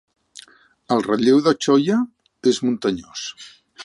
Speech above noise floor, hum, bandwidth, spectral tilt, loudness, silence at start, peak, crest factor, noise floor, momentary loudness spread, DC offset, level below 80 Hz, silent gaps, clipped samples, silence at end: 29 dB; none; 11.5 kHz; -5 dB/octave; -19 LUFS; 0.9 s; -4 dBFS; 18 dB; -48 dBFS; 15 LU; under 0.1%; -62 dBFS; none; under 0.1%; 0 s